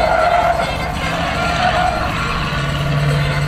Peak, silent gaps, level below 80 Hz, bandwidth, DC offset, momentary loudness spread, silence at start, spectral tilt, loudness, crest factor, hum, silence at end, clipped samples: -2 dBFS; none; -28 dBFS; 15.5 kHz; under 0.1%; 5 LU; 0 s; -5.5 dB/octave; -17 LUFS; 14 dB; none; 0 s; under 0.1%